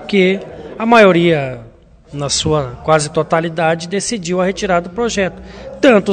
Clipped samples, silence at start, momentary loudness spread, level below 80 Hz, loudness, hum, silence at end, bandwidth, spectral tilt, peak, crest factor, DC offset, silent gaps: 0.2%; 0 s; 15 LU; -42 dBFS; -14 LUFS; none; 0 s; 11 kHz; -4.5 dB/octave; 0 dBFS; 14 dB; under 0.1%; none